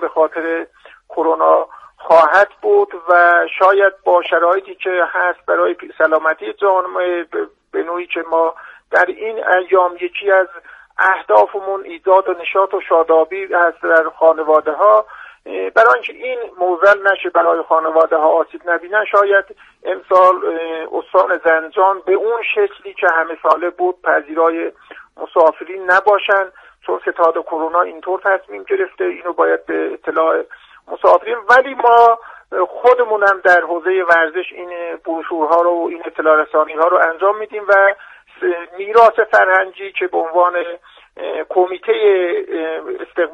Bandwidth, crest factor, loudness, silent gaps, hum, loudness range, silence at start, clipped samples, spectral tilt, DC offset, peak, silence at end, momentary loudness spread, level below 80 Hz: 7.8 kHz; 14 dB; -15 LUFS; none; none; 5 LU; 0 s; under 0.1%; -4 dB/octave; under 0.1%; 0 dBFS; 0 s; 12 LU; -64 dBFS